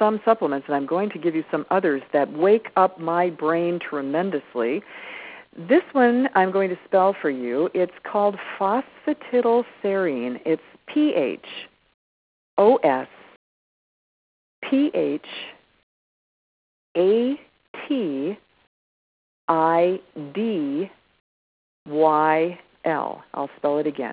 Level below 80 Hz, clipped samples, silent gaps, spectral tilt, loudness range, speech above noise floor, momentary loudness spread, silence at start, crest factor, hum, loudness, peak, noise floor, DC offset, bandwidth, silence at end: -72 dBFS; under 0.1%; 11.94-12.57 s, 13.36-14.62 s, 15.83-16.95 s, 17.68-17.74 s, 18.67-19.48 s, 21.20-21.86 s; -10 dB/octave; 5 LU; over 68 dB; 14 LU; 0 s; 20 dB; none; -22 LUFS; -4 dBFS; under -90 dBFS; under 0.1%; 4 kHz; 0 s